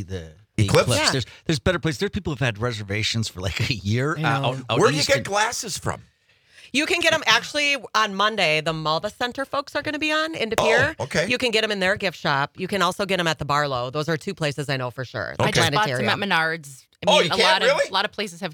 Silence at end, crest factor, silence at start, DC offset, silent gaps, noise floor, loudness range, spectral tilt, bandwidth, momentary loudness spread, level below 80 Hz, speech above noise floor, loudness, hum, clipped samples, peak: 0 s; 22 dB; 0 s; under 0.1%; none; -55 dBFS; 3 LU; -4 dB/octave; 19.5 kHz; 9 LU; -50 dBFS; 32 dB; -22 LUFS; none; under 0.1%; 0 dBFS